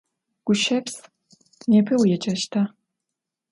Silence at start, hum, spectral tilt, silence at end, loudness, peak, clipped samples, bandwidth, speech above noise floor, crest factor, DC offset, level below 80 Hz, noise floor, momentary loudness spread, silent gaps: 0.45 s; none; -5 dB/octave; 0.85 s; -22 LUFS; -8 dBFS; under 0.1%; 11.5 kHz; 64 dB; 16 dB; under 0.1%; -66 dBFS; -84 dBFS; 14 LU; none